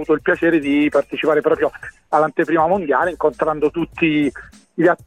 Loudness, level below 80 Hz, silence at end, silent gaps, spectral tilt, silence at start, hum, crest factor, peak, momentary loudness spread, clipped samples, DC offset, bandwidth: -18 LUFS; -50 dBFS; 0.1 s; none; -7 dB/octave; 0 s; none; 14 dB; -2 dBFS; 5 LU; under 0.1%; under 0.1%; 10 kHz